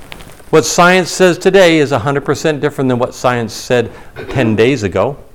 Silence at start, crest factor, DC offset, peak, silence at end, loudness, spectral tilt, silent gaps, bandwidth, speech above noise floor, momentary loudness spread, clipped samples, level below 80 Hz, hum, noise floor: 0 s; 12 dB; 1%; 0 dBFS; 0.15 s; -12 LUFS; -5 dB/octave; none; 18 kHz; 21 dB; 8 LU; under 0.1%; -40 dBFS; none; -33 dBFS